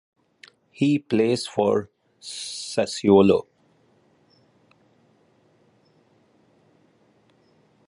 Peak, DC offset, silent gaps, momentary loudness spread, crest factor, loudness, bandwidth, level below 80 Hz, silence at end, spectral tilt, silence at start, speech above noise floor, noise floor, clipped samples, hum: -4 dBFS; under 0.1%; none; 17 LU; 22 dB; -22 LUFS; 11.5 kHz; -60 dBFS; 4.45 s; -5.5 dB/octave; 0.8 s; 41 dB; -62 dBFS; under 0.1%; none